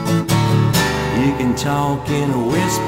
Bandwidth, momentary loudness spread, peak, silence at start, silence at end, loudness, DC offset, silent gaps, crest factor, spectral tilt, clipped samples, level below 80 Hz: 16.5 kHz; 4 LU; -2 dBFS; 0 s; 0 s; -17 LUFS; under 0.1%; none; 14 dB; -5.5 dB/octave; under 0.1%; -36 dBFS